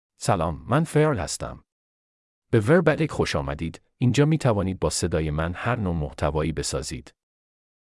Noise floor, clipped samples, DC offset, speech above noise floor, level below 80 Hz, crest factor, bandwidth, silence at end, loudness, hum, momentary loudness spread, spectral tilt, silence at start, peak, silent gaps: under -90 dBFS; under 0.1%; under 0.1%; over 67 dB; -44 dBFS; 18 dB; 12 kHz; 0.9 s; -24 LUFS; none; 11 LU; -6 dB/octave; 0.2 s; -6 dBFS; 1.72-2.42 s